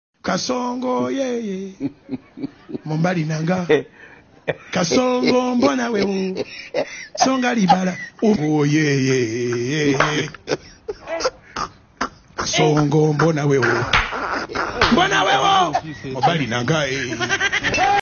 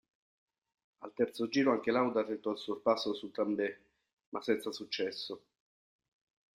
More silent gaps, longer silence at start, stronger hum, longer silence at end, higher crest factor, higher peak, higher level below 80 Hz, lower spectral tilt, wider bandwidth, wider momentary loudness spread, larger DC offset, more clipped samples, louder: second, none vs 4.13-4.17 s, 4.26-4.32 s; second, 0.25 s vs 1 s; neither; second, 0 s vs 1.2 s; about the same, 18 dB vs 20 dB; first, -2 dBFS vs -16 dBFS; first, -46 dBFS vs -80 dBFS; about the same, -5 dB/octave vs -5 dB/octave; second, 7 kHz vs 15.5 kHz; about the same, 13 LU vs 14 LU; neither; neither; first, -19 LUFS vs -34 LUFS